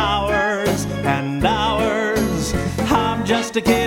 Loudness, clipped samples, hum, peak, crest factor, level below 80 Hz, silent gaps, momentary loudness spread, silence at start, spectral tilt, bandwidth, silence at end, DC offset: -19 LUFS; under 0.1%; none; -2 dBFS; 16 dB; -34 dBFS; none; 3 LU; 0 s; -5 dB/octave; 17.5 kHz; 0 s; under 0.1%